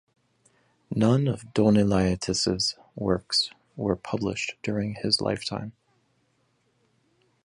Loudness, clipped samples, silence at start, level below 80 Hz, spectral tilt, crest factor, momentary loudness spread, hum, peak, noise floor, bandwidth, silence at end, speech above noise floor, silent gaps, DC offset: -26 LUFS; under 0.1%; 0.9 s; -50 dBFS; -5 dB/octave; 20 dB; 11 LU; none; -8 dBFS; -70 dBFS; 11.5 kHz; 1.75 s; 44 dB; none; under 0.1%